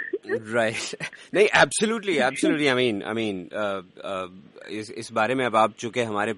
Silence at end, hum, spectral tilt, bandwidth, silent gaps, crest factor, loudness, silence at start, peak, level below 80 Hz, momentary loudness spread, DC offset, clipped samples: 0 s; none; -3.5 dB/octave; 11.5 kHz; none; 20 dB; -24 LUFS; 0 s; -6 dBFS; -64 dBFS; 14 LU; under 0.1%; under 0.1%